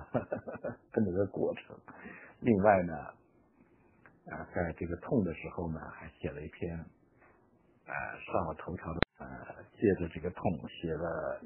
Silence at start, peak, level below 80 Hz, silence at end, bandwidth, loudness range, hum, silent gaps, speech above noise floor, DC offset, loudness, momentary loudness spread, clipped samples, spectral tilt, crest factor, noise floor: 0 s; -4 dBFS; -56 dBFS; 0 s; 3.2 kHz; 7 LU; none; none; 33 dB; under 0.1%; -35 LUFS; 17 LU; under 0.1%; -4 dB/octave; 32 dB; -67 dBFS